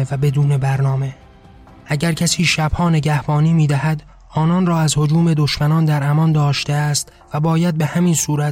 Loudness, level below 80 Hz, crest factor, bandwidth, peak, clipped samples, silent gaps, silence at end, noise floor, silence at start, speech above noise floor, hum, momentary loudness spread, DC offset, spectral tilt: -17 LUFS; -40 dBFS; 14 dB; 15.5 kHz; -4 dBFS; under 0.1%; none; 0 s; -43 dBFS; 0 s; 27 dB; none; 6 LU; under 0.1%; -5.5 dB/octave